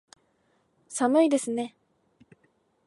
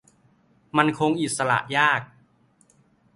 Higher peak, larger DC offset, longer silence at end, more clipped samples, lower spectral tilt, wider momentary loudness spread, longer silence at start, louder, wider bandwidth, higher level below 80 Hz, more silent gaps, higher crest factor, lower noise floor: second, -10 dBFS vs -2 dBFS; neither; about the same, 1.2 s vs 1.1 s; neither; about the same, -3.5 dB/octave vs -4 dB/octave; first, 15 LU vs 5 LU; first, 0.9 s vs 0.75 s; second, -26 LUFS vs -22 LUFS; about the same, 11.5 kHz vs 11.5 kHz; second, -82 dBFS vs -64 dBFS; neither; second, 18 dB vs 24 dB; first, -69 dBFS vs -61 dBFS